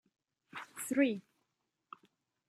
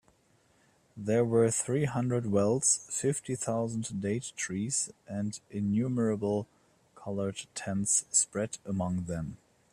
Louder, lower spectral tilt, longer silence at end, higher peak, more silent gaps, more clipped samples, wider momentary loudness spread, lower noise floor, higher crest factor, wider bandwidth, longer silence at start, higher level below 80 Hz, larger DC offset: second, -35 LUFS vs -30 LUFS; about the same, -4 dB/octave vs -5 dB/octave; first, 1.3 s vs 0.4 s; about the same, -16 dBFS vs -14 dBFS; neither; neither; first, 25 LU vs 11 LU; first, -85 dBFS vs -67 dBFS; about the same, 22 dB vs 18 dB; about the same, 14.5 kHz vs 14.5 kHz; second, 0.55 s vs 0.95 s; second, -88 dBFS vs -64 dBFS; neither